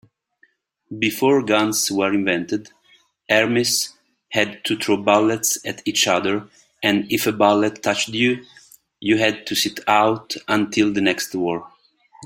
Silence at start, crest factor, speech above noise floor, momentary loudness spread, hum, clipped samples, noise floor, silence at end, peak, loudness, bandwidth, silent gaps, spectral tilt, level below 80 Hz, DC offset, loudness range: 0.9 s; 20 dB; 41 dB; 8 LU; none; under 0.1%; -61 dBFS; 0 s; 0 dBFS; -19 LUFS; 16.5 kHz; none; -3 dB/octave; -62 dBFS; under 0.1%; 2 LU